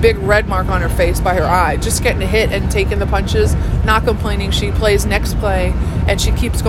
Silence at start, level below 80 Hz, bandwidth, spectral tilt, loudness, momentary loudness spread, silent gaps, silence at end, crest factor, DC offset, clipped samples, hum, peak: 0 s; -20 dBFS; 16 kHz; -5 dB/octave; -15 LUFS; 3 LU; none; 0 s; 14 dB; under 0.1%; under 0.1%; none; 0 dBFS